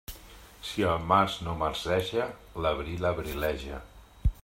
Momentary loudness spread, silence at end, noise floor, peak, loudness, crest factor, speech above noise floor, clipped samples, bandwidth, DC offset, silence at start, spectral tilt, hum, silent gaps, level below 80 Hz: 17 LU; 0.05 s; -50 dBFS; -8 dBFS; -30 LUFS; 24 dB; 21 dB; under 0.1%; 16 kHz; under 0.1%; 0.1 s; -5.5 dB/octave; none; none; -40 dBFS